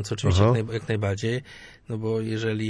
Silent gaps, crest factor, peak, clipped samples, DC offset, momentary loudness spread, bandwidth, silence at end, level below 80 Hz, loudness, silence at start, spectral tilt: none; 18 dB; -8 dBFS; under 0.1%; under 0.1%; 14 LU; 10.5 kHz; 0 s; -46 dBFS; -25 LUFS; 0 s; -6.5 dB/octave